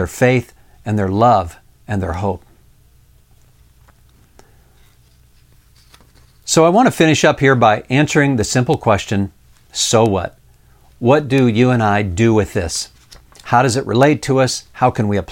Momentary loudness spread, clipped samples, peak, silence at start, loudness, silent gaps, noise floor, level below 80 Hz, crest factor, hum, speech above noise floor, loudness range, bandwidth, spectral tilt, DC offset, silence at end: 11 LU; under 0.1%; 0 dBFS; 0 s; -15 LUFS; none; -50 dBFS; -42 dBFS; 16 dB; none; 36 dB; 8 LU; 17 kHz; -5 dB/octave; under 0.1%; 0 s